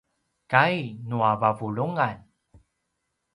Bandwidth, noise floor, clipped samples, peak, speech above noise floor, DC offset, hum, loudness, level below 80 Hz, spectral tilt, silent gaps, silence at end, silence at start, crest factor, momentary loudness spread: 11.5 kHz; -78 dBFS; under 0.1%; -2 dBFS; 54 dB; under 0.1%; none; -24 LUFS; -64 dBFS; -7.5 dB/octave; none; 1.15 s; 0.5 s; 24 dB; 10 LU